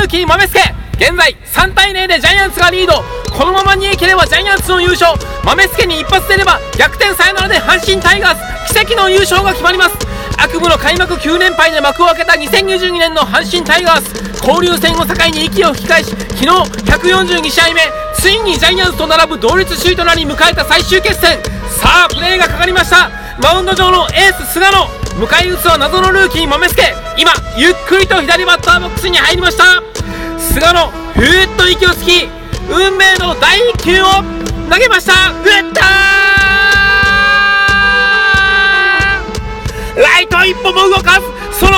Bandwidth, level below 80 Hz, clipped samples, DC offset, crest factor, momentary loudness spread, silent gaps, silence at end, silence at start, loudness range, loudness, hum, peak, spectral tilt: 18 kHz; -24 dBFS; 1%; under 0.1%; 10 dB; 6 LU; none; 0 s; 0 s; 3 LU; -8 LUFS; none; 0 dBFS; -3 dB/octave